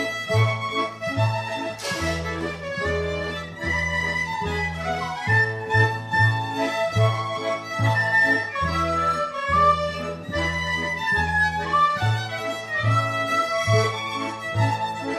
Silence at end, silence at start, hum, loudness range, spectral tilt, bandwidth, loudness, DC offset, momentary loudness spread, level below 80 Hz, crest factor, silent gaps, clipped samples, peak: 0 s; 0 s; none; 4 LU; -5 dB/octave; 13.5 kHz; -23 LUFS; under 0.1%; 8 LU; -44 dBFS; 16 dB; none; under 0.1%; -8 dBFS